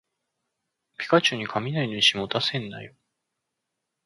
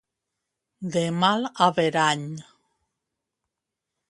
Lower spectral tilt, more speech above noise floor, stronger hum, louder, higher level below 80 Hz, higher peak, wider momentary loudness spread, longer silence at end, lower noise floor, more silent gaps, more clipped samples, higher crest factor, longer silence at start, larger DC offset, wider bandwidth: about the same, -4 dB/octave vs -4.5 dB/octave; second, 58 dB vs 62 dB; neither; about the same, -23 LUFS vs -23 LUFS; about the same, -66 dBFS vs -68 dBFS; about the same, -6 dBFS vs -4 dBFS; about the same, 16 LU vs 16 LU; second, 1.15 s vs 1.7 s; about the same, -82 dBFS vs -85 dBFS; neither; neither; about the same, 22 dB vs 22 dB; first, 1 s vs 0.8 s; neither; about the same, 11.5 kHz vs 11.5 kHz